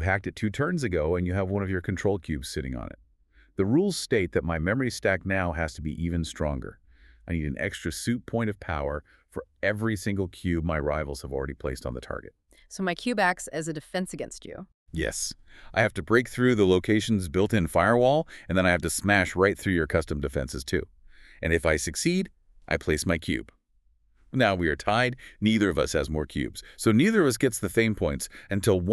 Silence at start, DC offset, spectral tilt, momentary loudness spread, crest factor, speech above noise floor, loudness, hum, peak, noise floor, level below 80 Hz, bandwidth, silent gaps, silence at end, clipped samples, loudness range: 0 s; under 0.1%; -5.5 dB/octave; 12 LU; 22 dB; 39 dB; -27 LUFS; none; -4 dBFS; -65 dBFS; -44 dBFS; 13.5 kHz; 14.74-14.86 s; 0 s; under 0.1%; 7 LU